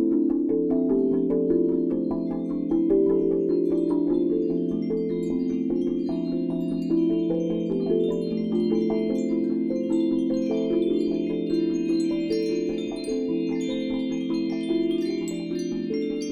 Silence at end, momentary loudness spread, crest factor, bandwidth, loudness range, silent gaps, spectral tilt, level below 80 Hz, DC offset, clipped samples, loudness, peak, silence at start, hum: 0 s; 5 LU; 14 dB; 10 kHz; 3 LU; none; -7.5 dB/octave; -52 dBFS; under 0.1%; under 0.1%; -25 LUFS; -10 dBFS; 0 s; none